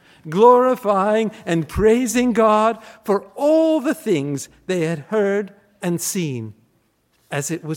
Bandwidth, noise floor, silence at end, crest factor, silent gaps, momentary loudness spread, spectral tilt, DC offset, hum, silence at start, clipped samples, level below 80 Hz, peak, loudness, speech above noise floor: 17 kHz; -63 dBFS; 0 s; 18 dB; none; 12 LU; -5.5 dB/octave; under 0.1%; none; 0.25 s; under 0.1%; -44 dBFS; -2 dBFS; -19 LUFS; 45 dB